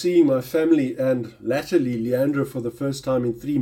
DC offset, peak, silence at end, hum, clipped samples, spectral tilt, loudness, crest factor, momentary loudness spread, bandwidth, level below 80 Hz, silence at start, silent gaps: under 0.1%; -6 dBFS; 0 s; none; under 0.1%; -7 dB/octave; -22 LUFS; 14 dB; 8 LU; 17 kHz; -56 dBFS; 0 s; none